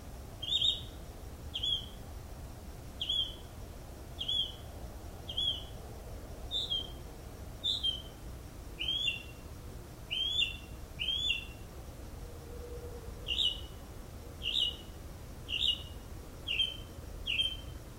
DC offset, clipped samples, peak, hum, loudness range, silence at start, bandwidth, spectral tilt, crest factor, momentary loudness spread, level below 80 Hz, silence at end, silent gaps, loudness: under 0.1%; under 0.1%; -18 dBFS; none; 3 LU; 0 s; 16 kHz; -2.5 dB/octave; 20 dB; 18 LU; -48 dBFS; 0 s; none; -33 LUFS